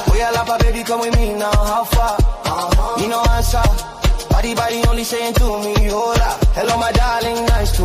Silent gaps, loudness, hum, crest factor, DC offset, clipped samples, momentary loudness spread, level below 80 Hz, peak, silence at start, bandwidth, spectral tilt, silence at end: none; -17 LUFS; none; 12 dB; under 0.1%; under 0.1%; 3 LU; -18 dBFS; -2 dBFS; 0 s; 15.5 kHz; -5 dB/octave; 0 s